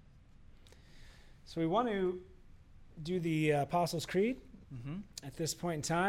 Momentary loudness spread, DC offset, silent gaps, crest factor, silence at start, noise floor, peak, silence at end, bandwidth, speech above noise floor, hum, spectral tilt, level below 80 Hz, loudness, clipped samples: 15 LU; under 0.1%; none; 18 dB; 0.15 s; -58 dBFS; -20 dBFS; 0 s; 16 kHz; 24 dB; none; -5.5 dB/octave; -60 dBFS; -35 LUFS; under 0.1%